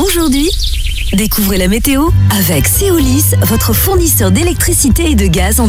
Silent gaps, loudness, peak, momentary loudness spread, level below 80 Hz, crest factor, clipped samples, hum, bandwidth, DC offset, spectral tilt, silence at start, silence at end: none; -10 LUFS; 0 dBFS; 4 LU; -16 dBFS; 10 dB; under 0.1%; none; 18.5 kHz; under 0.1%; -4.5 dB/octave; 0 s; 0 s